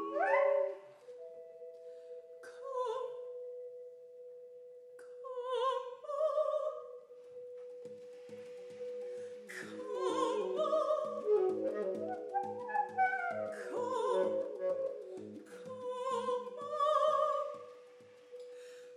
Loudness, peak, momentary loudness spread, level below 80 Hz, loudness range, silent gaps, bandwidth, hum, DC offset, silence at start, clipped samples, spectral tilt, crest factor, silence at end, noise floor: -36 LUFS; -18 dBFS; 20 LU; under -90 dBFS; 10 LU; none; 12 kHz; none; under 0.1%; 0 s; under 0.1%; -4 dB/octave; 20 dB; 0 s; -58 dBFS